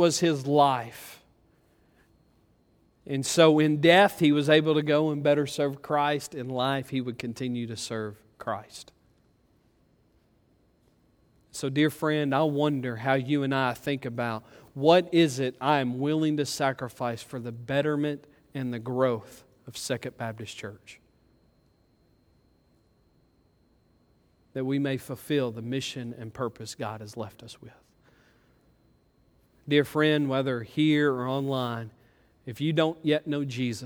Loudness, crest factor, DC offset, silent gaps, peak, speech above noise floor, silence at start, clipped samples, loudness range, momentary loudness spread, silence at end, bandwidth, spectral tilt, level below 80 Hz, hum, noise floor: -27 LUFS; 22 dB; under 0.1%; none; -6 dBFS; 39 dB; 0 s; under 0.1%; 16 LU; 17 LU; 0 s; 18.5 kHz; -5.5 dB/octave; -68 dBFS; none; -65 dBFS